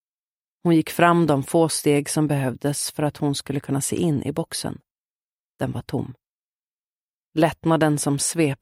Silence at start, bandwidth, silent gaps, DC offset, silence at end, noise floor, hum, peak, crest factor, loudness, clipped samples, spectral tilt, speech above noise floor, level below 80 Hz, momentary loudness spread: 0.65 s; 16 kHz; 4.91-5.55 s, 6.31-7.32 s; under 0.1%; 0.05 s; under -90 dBFS; none; -2 dBFS; 20 dB; -22 LUFS; under 0.1%; -5 dB/octave; over 69 dB; -56 dBFS; 11 LU